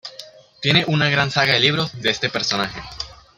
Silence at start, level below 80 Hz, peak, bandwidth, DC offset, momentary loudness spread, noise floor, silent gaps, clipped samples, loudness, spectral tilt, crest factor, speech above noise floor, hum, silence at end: 0.05 s; -50 dBFS; -2 dBFS; 15 kHz; under 0.1%; 16 LU; -42 dBFS; none; under 0.1%; -18 LUFS; -4 dB/octave; 20 dB; 23 dB; none; 0.25 s